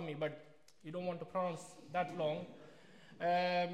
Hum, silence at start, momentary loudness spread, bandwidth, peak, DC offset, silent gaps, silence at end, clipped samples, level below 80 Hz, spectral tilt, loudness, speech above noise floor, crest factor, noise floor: none; 0 s; 23 LU; 12.5 kHz; -24 dBFS; under 0.1%; none; 0 s; under 0.1%; -84 dBFS; -5.5 dB/octave; -39 LUFS; 22 dB; 16 dB; -61 dBFS